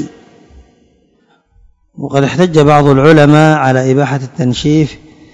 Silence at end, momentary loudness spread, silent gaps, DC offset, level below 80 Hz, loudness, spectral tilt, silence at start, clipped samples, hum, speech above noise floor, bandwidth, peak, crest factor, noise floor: 0.4 s; 11 LU; none; under 0.1%; -40 dBFS; -9 LUFS; -7 dB/octave; 0 s; 2%; none; 45 dB; 9.6 kHz; 0 dBFS; 12 dB; -53 dBFS